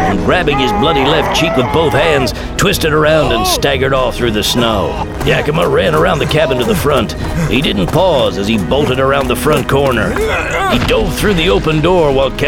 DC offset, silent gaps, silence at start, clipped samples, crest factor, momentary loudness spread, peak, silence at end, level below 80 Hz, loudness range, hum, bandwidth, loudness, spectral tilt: 0.3%; none; 0 s; under 0.1%; 12 dB; 3 LU; 0 dBFS; 0 s; -24 dBFS; 1 LU; none; 19 kHz; -12 LUFS; -5 dB/octave